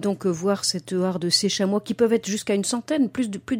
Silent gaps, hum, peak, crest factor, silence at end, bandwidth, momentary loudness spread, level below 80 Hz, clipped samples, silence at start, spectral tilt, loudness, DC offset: none; none; -6 dBFS; 18 dB; 0 s; 16.5 kHz; 4 LU; -62 dBFS; under 0.1%; 0 s; -4 dB/octave; -23 LUFS; under 0.1%